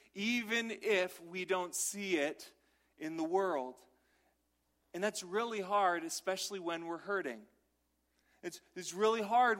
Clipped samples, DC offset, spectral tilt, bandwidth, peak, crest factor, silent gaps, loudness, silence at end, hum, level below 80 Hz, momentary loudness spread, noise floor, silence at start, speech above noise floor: under 0.1%; under 0.1%; -2.5 dB/octave; 16 kHz; -18 dBFS; 18 dB; none; -36 LUFS; 0 s; 60 Hz at -75 dBFS; -82 dBFS; 15 LU; -79 dBFS; 0.15 s; 44 dB